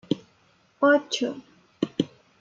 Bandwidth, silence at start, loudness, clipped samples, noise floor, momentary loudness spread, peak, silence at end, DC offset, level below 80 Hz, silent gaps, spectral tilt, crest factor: 7.6 kHz; 0.1 s; -26 LUFS; under 0.1%; -62 dBFS; 12 LU; -8 dBFS; 0.35 s; under 0.1%; -70 dBFS; none; -4.5 dB/octave; 20 dB